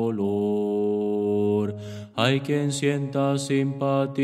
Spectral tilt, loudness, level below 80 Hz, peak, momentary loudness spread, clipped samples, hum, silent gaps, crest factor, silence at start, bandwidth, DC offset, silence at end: -6 dB/octave; -24 LUFS; -68 dBFS; -6 dBFS; 2 LU; under 0.1%; none; none; 18 dB; 0 s; 13.5 kHz; under 0.1%; 0 s